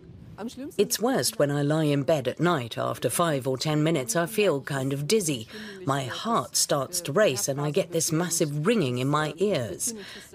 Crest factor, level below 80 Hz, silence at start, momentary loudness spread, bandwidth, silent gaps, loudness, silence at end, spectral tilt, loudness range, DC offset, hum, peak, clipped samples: 16 dB; -62 dBFS; 0.05 s; 6 LU; 16 kHz; none; -26 LUFS; 0.05 s; -4.5 dB/octave; 1 LU; under 0.1%; none; -10 dBFS; under 0.1%